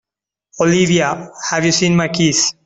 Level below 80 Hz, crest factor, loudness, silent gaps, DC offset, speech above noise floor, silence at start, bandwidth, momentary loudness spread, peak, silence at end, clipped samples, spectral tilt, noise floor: -52 dBFS; 14 dB; -15 LUFS; none; under 0.1%; 63 dB; 0.55 s; 8.4 kHz; 7 LU; -2 dBFS; 0.15 s; under 0.1%; -4 dB/octave; -78 dBFS